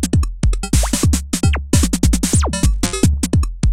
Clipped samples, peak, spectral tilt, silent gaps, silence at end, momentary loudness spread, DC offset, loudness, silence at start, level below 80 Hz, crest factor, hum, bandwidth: under 0.1%; 0 dBFS; -5 dB/octave; none; 0 s; 3 LU; 2%; -17 LUFS; 0 s; -20 dBFS; 16 dB; none; 16.5 kHz